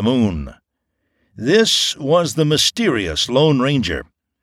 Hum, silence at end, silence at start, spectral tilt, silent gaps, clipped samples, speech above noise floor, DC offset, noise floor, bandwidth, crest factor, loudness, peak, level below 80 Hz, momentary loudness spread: none; 0.4 s; 0 s; -4 dB/octave; none; under 0.1%; 56 dB; under 0.1%; -73 dBFS; 16.5 kHz; 16 dB; -16 LUFS; -2 dBFS; -40 dBFS; 11 LU